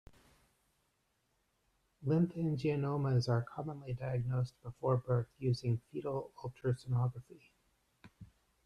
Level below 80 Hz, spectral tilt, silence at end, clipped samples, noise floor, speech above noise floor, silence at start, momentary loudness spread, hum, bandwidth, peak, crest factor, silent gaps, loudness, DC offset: -66 dBFS; -8.5 dB/octave; 0.4 s; under 0.1%; -79 dBFS; 44 dB; 2 s; 9 LU; none; 10 kHz; -18 dBFS; 18 dB; none; -36 LUFS; under 0.1%